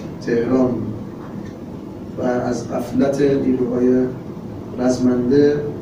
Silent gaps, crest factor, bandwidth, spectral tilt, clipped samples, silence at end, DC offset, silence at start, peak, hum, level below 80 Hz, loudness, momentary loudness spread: none; 16 dB; 15.5 kHz; -7.5 dB/octave; under 0.1%; 0 s; under 0.1%; 0 s; -4 dBFS; none; -46 dBFS; -18 LUFS; 16 LU